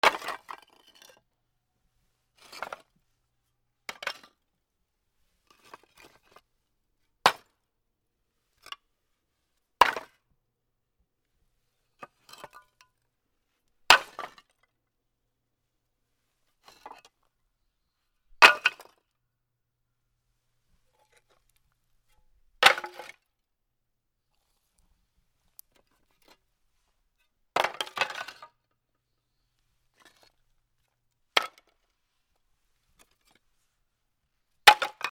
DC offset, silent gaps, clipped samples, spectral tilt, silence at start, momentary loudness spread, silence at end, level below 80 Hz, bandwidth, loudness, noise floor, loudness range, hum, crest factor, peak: under 0.1%; none; under 0.1%; 0 dB/octave; 0.05 s; 27 LU; 0 s; -68 dBFS; 19.5 kHz; -23 LUFS; -81 dBFS; 19 LU; none; 32 dB; 0 dBFS